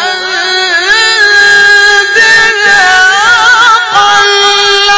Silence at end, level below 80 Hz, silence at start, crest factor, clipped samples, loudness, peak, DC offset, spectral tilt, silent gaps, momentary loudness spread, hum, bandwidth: 0 s; -42 dBFS; 0 s; 6 dB; 5%; -4 LUFS; 0 dBFS; under 0.1%; 0.5 dB/octave; none; 5 LU; none; 8 kHz